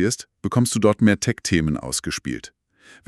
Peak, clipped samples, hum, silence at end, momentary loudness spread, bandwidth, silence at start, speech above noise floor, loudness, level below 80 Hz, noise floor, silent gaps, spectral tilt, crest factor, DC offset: -2 dBFS; under 0.1%; none; 0.6 s; 10 LU; 13.5 kHz; 0 s; 31 dB; -21 LUFS; -44 dBFS; -52 dBFS; none; -5 dB/octave; 18 dB; under 0.1%